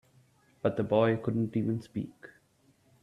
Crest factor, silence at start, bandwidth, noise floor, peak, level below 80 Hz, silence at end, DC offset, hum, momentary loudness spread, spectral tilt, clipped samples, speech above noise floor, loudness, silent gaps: 20 dB; 0.65 s; 11 kHz; -67 dBFS; -12 dBFS; -68 dBFS; 0.75 s; under 0.1%; none; 13 LU; -9 dB/octave; under 0.1%; 37 dB; -30 LUFS; none